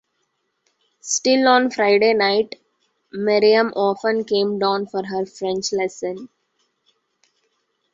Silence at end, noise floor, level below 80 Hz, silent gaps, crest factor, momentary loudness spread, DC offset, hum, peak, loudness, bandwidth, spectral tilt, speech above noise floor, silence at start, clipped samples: 1.7 s; -71 dBFS; -68 dBFS; none; 20 dB; 14 LU; under 0.1%; none; -2 dBFS; -19 LUFS; 8 kHz; -3 dB/octave; 53 dB; 1.05 s; under 0.1%